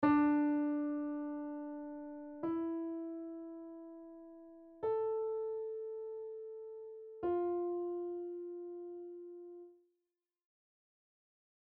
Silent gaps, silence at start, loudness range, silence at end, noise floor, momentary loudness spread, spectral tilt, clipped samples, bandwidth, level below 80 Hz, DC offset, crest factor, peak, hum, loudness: none; 0 s; 8 LU; 2.05 s; under -90 dBFS; 17 LU; -6.5 dB/octave; under 0.1%; 4.5 kHz; -76 dBFS; under 0.1%; 20 dB; -20 dBFS; none; -39 LUFS